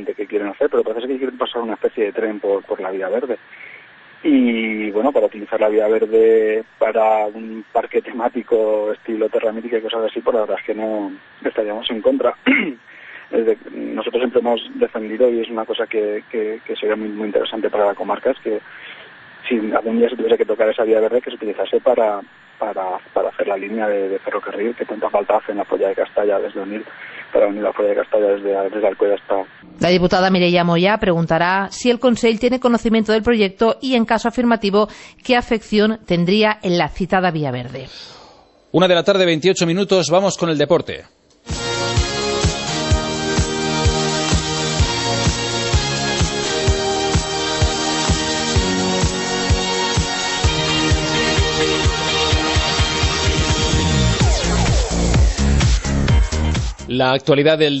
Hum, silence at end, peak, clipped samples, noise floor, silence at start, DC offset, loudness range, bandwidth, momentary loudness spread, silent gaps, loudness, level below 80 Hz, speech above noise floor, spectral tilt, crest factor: none; 0 s; -2 dBFS; under 0.1%; -47 dBFS; 0 s; under 0.1%; 4 LU; 8.4 kHz; 9 LU; none; -18 LUFS; -28 dBFS; 29 dB; -4.5 dB/octave; 16 dB